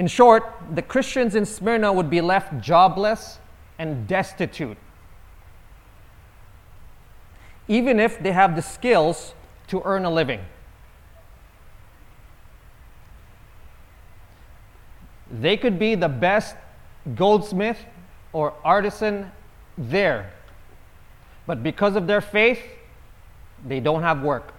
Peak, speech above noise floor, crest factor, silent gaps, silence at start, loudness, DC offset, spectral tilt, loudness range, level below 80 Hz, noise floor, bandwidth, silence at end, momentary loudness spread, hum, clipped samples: 0 dBFS; 27 dB; 22 dB; none; 0 s; -21 LUFS; under 0.1%; -5.5 dB/octave; 10 LU; -48 dBFS; -47 dBFS; 17.5 kHz; 0.1 s; 17 LU; none; under 0.1%